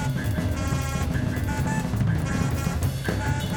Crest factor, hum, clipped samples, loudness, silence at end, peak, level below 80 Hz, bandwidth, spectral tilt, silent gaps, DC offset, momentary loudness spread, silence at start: 14 dB; none; under 0.1%; -26 LUFS; 0 s; -10 dBFS; -34 dBFS; 19 kHz; -6 dB/octave; none; under 0.1%; 2 LU; 0 s